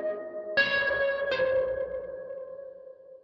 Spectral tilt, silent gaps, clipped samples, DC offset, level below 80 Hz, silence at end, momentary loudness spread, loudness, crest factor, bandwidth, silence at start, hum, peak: -4.5 dB/octave; none; under 0.1%; under 0.1%; -60 dBFS; 0.05 s; 19 LU; -28 LUFS; 18 dB; 6.4 kHz; 0 s; none; -12 dBFS